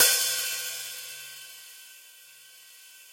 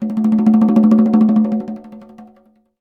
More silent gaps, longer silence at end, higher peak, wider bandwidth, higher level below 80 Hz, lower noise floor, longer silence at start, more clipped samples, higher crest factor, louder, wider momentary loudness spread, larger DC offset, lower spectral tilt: neither; second, 0 s vs 0.55 s; second, -6 dBFS vs -2 dBFS; first, 17 kHz vs 3.3 kHz; second, -82 dBFS vs -56 dBFS; about the same, -52 dBFS vs -53 dBFS; about the same, 0 s vs 0 s; neither; first, 24 dB vs 12 dB; second, -27 LUFS vs -13 LUFS; first, 24 LU vs 14 LU; neither; second, 3.5 dB/octave vs -10 dB/octave